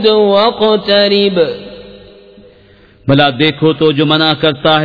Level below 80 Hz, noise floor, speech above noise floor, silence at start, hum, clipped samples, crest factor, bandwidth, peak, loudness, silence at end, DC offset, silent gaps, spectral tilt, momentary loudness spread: -46 dBFS; -43 dBFS; 33 dB; 0 s; none; under 0.1%; 12 dB; 5.4 kHz; 0 dBFS; -10 LUFS; 0 s; under 0.1%; none; -8 dB/octave; 7 LU